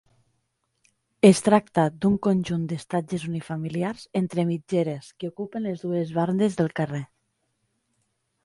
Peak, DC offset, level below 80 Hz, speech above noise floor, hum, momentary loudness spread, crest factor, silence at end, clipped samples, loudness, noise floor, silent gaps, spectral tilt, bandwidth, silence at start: -4 dBFS; under 0.1%; -60 dBFS; 51 dB; none; 12 LU; 22 dB; 1.4 s; under 0.1%; -25 LUFS; -74 dBFS; none; -6.5 dB/octave; 11.5 kHz; 1.25 s